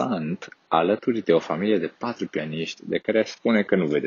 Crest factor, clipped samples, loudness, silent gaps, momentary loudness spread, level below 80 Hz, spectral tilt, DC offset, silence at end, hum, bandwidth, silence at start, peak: 18 dB; under 0.1%; -24 LUFS; none; 9 LU; -68 dBFS; -5 dB/octave; under 0.1%; 0 s; none; 7.2 kHz; 0 s; -6 dBFS